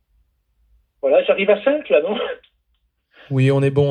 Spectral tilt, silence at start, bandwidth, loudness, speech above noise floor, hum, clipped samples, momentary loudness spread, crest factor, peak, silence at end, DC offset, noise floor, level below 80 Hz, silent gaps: -8 dB/octave; 1.05 s; 9.4 kHz; -18 LUFS; 51 dB; none; under 0.1%; 9 LU; 18 dB; -2 dBFS; 0 s; under 0.1%; -68 dBFS; -60 dBFS; none